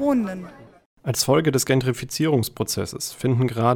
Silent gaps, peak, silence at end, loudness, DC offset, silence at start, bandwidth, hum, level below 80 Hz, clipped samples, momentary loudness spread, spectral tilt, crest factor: 0.86-0.97 s; -6 dBFS; 0 s; -22 LUFS; under 0.1%; 0 s; 18.5 kHz; none; -54 dBFS; under 0.1%; 11 LU; -5 dB/octave; 16 dB